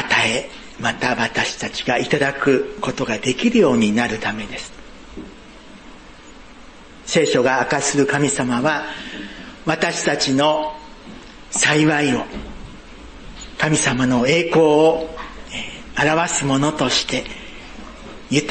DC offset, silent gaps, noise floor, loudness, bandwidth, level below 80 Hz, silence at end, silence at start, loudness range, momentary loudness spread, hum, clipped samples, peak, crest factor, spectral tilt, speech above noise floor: under 0.1%; none; -41 dBFS; -18 LUFS; 8.8 kHz; -44 dBFS; 0 s; 0 s; 4 LU; 22 LU; none; under 0.1%; -4 dBFS; 16 dB; -4 dB/octave; 23 dB